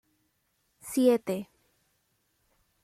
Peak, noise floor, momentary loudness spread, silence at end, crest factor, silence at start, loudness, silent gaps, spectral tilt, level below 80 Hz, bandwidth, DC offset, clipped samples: -12 dBFS; -75 dBFS; 23 LU; 1.4 s; 22 dB; 0.85 s; -28 LUFS; none; -5.5 dB/octave; -74 dBFS; 16 kHz; under 0.1%; under 0.1%